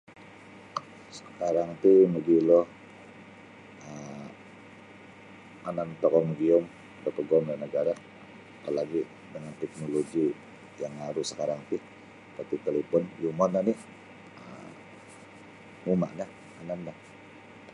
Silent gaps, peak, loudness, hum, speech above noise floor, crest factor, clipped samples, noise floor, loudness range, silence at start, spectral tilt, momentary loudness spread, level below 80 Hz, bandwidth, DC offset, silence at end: none; -10 dBFS; -28 LUFS; none; 23 dB; 20 dB; under 0.1%; -50 dBFS; 11 LU; 0.1 s; -7 dB/octave; 25 LU; -70 dBFS; 11 kHz; under 0.1%; 0.05 s